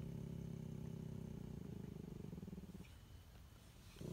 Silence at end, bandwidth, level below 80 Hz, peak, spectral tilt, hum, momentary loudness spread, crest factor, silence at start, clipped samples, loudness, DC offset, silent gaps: 0 s; 16 kHz; -62 dBFS; -38 dBFS; -7.5 dB/octave; none; 12 LU; 14 dB; 0 s; under 0.1%; -53 LUFS; under 0.1%; none